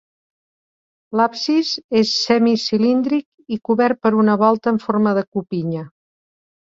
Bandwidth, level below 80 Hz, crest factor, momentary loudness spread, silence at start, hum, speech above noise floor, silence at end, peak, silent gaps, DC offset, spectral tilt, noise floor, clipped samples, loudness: 7.6 kHz; -62 dBFS; 16 dB; 9 LU; 1.1 s; none; over 73 dB; 0.85 s; -2 dBFS; 1.84-1.89 s, 3.26-3.38 s, 5.27-5.32 s; under 0.1%; -5.5 dB/octave; under -90 dBFS; under 0.1%; -18 LUFS